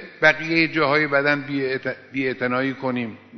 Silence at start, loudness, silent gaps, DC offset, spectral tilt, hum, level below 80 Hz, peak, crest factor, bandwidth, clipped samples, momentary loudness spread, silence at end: 0 s; -21 LUFS; none; under 0.1%; -3 dB/octave; none; -62 dBFS; -4 dBFS; 18 dB; 6.4 kHz; under 0.1%; 8 LU; 0 s